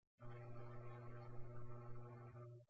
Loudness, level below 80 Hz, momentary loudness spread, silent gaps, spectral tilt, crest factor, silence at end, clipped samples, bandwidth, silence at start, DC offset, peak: -57 LUFS; -66 dBFS; 2 LU; none; -8.5 dB/octave; 14 dB; 0.05 s; under 0.1%; 5.8 kHz; 0.2 s; under 0.1%; -38 dBFS